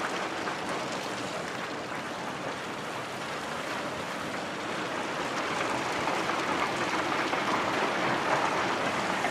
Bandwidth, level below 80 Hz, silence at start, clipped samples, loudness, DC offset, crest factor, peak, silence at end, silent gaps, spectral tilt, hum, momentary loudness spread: 15.5 kHz; -66 dBFS; 0 s; under 0.1%; -31 LUFS; under 0.1%; 20 dB; -12 dBFS; 0 s; none; -3.5 dB/octave; none; 7 LU